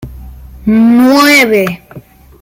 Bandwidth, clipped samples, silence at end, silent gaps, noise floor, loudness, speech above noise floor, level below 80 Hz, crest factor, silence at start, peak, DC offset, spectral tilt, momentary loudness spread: 16.5 kHz; under 0.1%; 0.4 s; none; -29 dBFS; -8 LUFS; 22 dB; -34 dBFS; 10 dB; 0 s; 0 dBFS; under 0.1%; -4.5 dB/octave; 13 LU